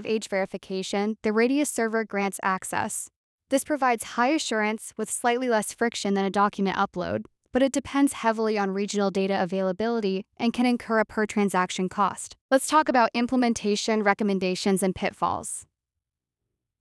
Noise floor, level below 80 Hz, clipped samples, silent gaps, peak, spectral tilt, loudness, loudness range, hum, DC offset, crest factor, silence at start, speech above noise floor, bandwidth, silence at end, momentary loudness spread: -86 dBFS; -62 dBFS; under 0.1%; 3.16-3.38 s, 12.41-12.49 s; -6 dBFS; -4.5 dB/octave; -25 LUFS; 3 LU; none; under 0.1%; 20 dB; 0 s; 61 dB; 12 kHz; 1.2 s; 7 LU